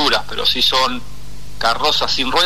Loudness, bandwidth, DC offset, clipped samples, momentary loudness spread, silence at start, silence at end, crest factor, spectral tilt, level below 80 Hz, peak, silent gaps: -16 LUFS; 13.5 kHz; 7%; under 0.1%; 7 LU; 0 s; 0 s; 14 dB; -2 dB/octave; -38 dBFS; -2 dBFS; none